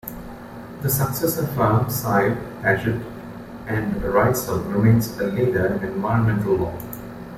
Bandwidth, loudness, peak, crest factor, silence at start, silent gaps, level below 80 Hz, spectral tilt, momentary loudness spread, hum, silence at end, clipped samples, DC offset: 16.5 kHz; -21 LUFS; -4 dBFS; 18 dB; 0.05 s; none; -44 dBFS; -6.5 dB/octave; 16 LU; none; 0 s; under 0.1%; under 0.1%